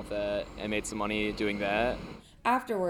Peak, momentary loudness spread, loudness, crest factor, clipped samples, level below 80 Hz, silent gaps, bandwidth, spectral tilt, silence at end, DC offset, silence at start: -14 dBFS; 5 LU; -31 LUFS; 18 dB; under 0.1%; -50 dBFS; none; 18 kHz; -4.5 dB/octave; 0 s; under 0.1%; 0 s